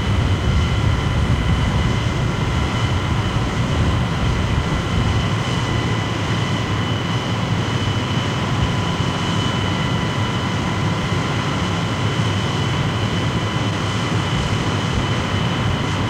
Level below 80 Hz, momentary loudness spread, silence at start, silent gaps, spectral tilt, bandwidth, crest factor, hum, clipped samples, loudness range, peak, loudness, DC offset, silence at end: -28 dBFS; 2 LU; 0 s; none; -5.5 dB/octave; 11.5 kHz; 14 dB; none; under 0.1%; 1 LU; -6 dBFS; -20 LUFS; under 0.1%; 0 s